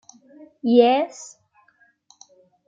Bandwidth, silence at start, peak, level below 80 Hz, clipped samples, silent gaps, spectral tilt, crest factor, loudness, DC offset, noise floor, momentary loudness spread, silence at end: 7.8 kHz; 0.65 s; -4 dBFS; -76 dBFS; under 0.1%; none; -4.5 dB/octave; 20 dB; -19 LUFS; under 0.1%; -61 dBFS; 24 LU; 1.45 s